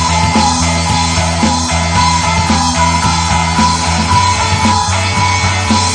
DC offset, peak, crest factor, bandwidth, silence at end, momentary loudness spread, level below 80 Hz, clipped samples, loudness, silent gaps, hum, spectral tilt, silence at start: under 0.1%; 0 dBFS; 12 dB; 10 kHz; 0 s; 2 LU; -24 dBFS; under 0.1%; -11 LUFS; none; none; -3.5 dB/octave; 0 s